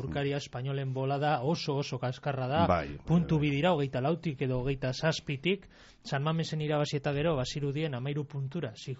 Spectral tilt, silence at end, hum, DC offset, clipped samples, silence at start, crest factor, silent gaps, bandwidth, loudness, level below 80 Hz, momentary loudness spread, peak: -5.5 dB/octave; 0 s; none; under 0.1%; under 0.1%; 0 s; 18 dB; none; 8 kHz; -31 LUFS; -52 dBFS; 8 LU; -14 dBFS